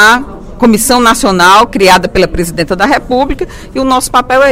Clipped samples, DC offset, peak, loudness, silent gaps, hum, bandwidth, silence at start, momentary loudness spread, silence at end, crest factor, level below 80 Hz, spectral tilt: 2%; under 0.1%; 0 dBFS; -8 LUFS; none; none; 19 kHz; 0 s; 10 LU; 0 s; 8 dB; -26 dBFS; -3.5 dB/octave